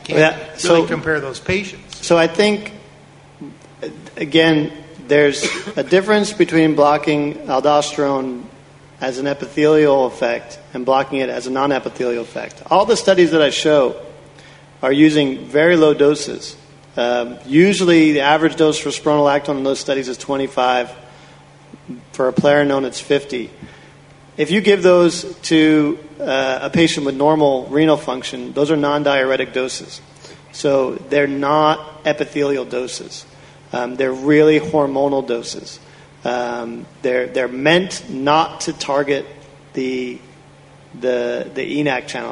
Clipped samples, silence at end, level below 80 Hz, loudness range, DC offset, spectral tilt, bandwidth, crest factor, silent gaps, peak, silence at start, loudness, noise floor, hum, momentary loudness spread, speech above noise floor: under 0.1%; 0 s; -54 dBFS; 5 LU; under 0.1%; -5 dB/octave; 11 kHz; 16 dB; none; 0 dBFS; 0.05 s; -16 LUFS; -44 dBFS; none; 15 LU; 28 dB